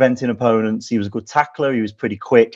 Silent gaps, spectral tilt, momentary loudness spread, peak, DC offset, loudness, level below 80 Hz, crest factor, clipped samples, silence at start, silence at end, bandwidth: none; -6.5 dB/octave; 6 LU; 0 dBFS; under 0.1%; -19 LUFS; -54 dBFS; 18 dB; under 0.1%; 0 s; 0 s; 7.8 kHz